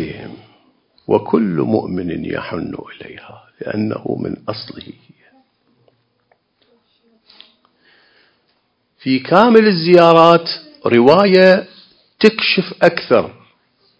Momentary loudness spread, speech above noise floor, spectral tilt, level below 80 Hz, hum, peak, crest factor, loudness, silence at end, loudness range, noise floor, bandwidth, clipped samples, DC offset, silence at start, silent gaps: 22 LU; 50 dB; -7 dB/octave; -54 dBFS; none; 0 dBFS; 16 dB; -13 LUFS; 0.7 s; 16 LU; -64 dBFS; 8 kHz; 0.3%; under 0.1%; 0 s; none